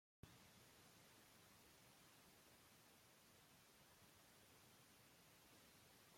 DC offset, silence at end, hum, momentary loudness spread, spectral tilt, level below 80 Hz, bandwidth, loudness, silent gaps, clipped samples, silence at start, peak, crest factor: under 0.1%; 0 s; none; 2 LU; -3 dB/octave; -88 dBFS; 16.5 kHz; -69 LUFS; none; under 0.1%; 0.25 s; -46 dBFS; 24 dB